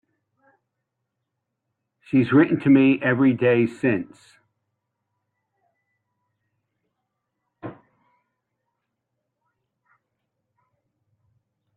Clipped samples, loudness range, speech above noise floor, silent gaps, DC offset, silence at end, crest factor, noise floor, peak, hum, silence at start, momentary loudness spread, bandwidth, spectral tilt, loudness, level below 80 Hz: under 0.1%; 8 LU; 61 dB; none; under 0.1%; 4.05 s; 22 dB; -80 dBFS; -4 dBFS; none; 2.15 s; 24 LU; 4.5 kHz; -9 dB/octave; -19 LUFS; -68 dBFS